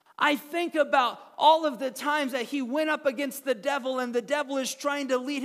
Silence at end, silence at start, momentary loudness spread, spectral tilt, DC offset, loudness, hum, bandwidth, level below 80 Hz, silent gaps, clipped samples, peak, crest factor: 0 s; 0.2 s; 7 LU; -2 dB/octave; under 0.1%; -27 LUFS; none; 16 kHz; -88 dBFS; none; under 0.1%; -8 dBFS; 18 dB